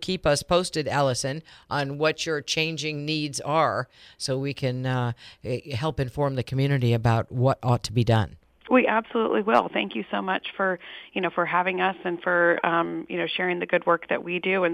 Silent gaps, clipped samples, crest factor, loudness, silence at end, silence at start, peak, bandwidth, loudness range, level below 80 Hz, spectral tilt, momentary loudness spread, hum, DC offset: none; under 0.1%; 20 dB; -25 LUFS; 0 s; 0 s; -6 dBFS; 14 kHz; 4 LU; -52 dBFS; -5.5 dB/octave; 8 LU; none; under 0.1%